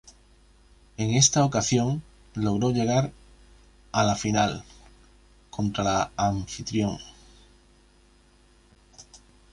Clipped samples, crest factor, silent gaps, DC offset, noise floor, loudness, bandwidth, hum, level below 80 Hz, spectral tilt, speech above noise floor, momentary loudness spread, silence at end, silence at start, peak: under 0.1%; 22 dB; none; under 0.1%; -58 dBFS; -25 LUFS; 11.5 kHz; none; -50 dBFS; -4.5 dB/octave; 34 dB; 18 LU; 0.35 s; 0.05 s; -6 dBFS